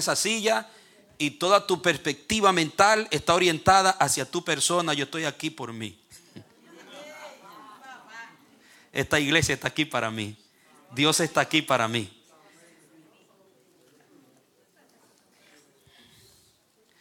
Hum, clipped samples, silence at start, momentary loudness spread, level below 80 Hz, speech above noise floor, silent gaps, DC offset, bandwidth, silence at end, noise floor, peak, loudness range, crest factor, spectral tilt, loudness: none; under 0.1%; 0 s; 23 LU; -58 dBFS; 40 dB; none; under 0.1%; 18 kHz; 4.9 s; -64 dBFS; -2 dBFS; 14 LU; 24 dB; -3 dB/octave; -24 LUFS